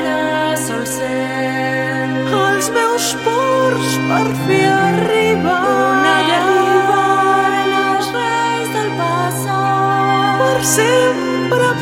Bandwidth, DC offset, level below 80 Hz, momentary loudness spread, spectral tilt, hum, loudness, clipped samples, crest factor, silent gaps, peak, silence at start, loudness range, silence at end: 16.5 kHz; under 0.1%; -52 dBFS; 6 LU; -4 dB/octave; none; -14 LUFS; under 0.1%; 14 dB; none; -2 dBFS; 0 s; 3 LU; 0 s